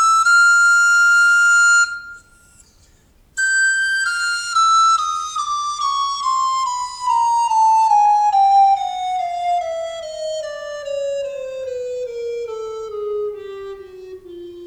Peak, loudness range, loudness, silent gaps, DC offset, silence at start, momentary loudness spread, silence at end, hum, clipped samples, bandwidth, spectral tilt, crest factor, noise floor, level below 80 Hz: -6 dBFS; 11 LU; -16 LUFS; none; under 0.1%; 0 s; 17 LU; 0 s; none; under 0.1%; 13.5 kHz; 1 dB/octave; 12 dB; -53 dBFS; -56 dBFS